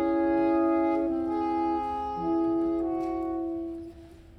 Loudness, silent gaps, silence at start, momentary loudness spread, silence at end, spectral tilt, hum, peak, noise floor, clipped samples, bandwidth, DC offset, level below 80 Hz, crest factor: -28 LUFS; none; 0 s; 9 LU; 0 s; -8.5 dB/octave; none; -16 dBFS; -48 dBFS; under 0.1%; 5.8 kHz; under 0.1%; -52 dBFS; 12 dB